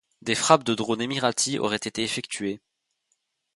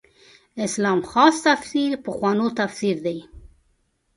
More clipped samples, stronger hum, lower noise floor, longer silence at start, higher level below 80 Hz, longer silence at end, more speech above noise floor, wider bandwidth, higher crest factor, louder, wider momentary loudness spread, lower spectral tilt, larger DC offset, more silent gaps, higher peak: neither; neither; first, -75 dBFS vs -67 dBFS; second, 0.25 s vs 0.55 s; second, -66 dBFS vs -56 dBFS; first, 1 s vs 0.7 s; first, 50 dB vs 46 dB; about the same, 11.5 kHz vs 11.5 kHz; about the same, 24 dB vs 22 dB; second, -25 LUFS vs -21 LUFS; about the same, 11 LU vs 13 LU; second, -3 dB/octave vs -4.5 dB/octave; neither; neither; about the same, -2 dBFS vs 0 dBFS